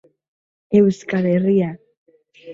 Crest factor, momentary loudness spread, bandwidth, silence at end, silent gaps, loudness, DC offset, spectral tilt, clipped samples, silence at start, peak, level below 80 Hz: 18 dB; 5 LU; 7.6 kHz; 0 s; 1.97-2.06 s; -18 LUFS; under 0.1%; -8.5 dB/octave; under 0.1%; 0.7 s; -2 dBFS; -60 dBFS